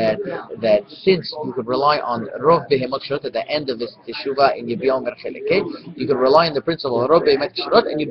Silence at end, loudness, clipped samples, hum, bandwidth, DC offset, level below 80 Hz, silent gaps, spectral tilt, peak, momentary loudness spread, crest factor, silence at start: 0 s; -19 LUFS; under 0.1%; none; 6.2 kHz; under 0.1%; -56 dBFS; none; -7.5 dB/octave; 0 dBFS; 11 LU; 18 dB; 0 s